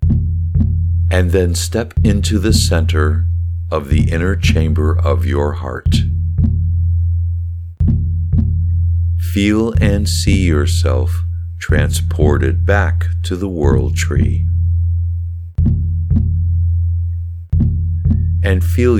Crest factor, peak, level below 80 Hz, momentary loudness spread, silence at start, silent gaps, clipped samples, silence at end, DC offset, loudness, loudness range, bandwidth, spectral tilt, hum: 14 dB; 0 dBFS; -20 dBFS; 6 LU; 0 s; none; under 0.1%; 0 s; under 0.1%; -16 LUFS; 2 LU; 13.5 kHz; -6.5 dB/octave; none